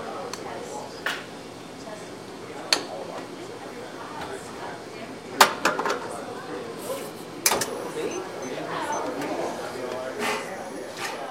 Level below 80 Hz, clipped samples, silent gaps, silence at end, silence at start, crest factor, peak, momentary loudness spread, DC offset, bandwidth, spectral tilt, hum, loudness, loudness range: -66 dBFS; under 0.1%; none; 0 s; 0 s; 30 dB; 0 dBFS; 15 LU; under 0.1%; 16 kHz; -2 dB/octave; none; -29 LUFS; 6 LU